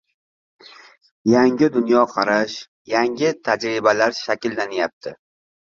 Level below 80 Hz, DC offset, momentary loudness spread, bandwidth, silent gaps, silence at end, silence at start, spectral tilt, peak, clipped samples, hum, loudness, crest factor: -62 dBFS; under 0.1%; 10 LU; 7.6 kHz; 2.68-2.85 s, 4.93-5.01 s; 0.65 s; 1.25 s; -5 dB/octave; 0 dBFS; under 0.1%; none; -19 LUFS; 20 dB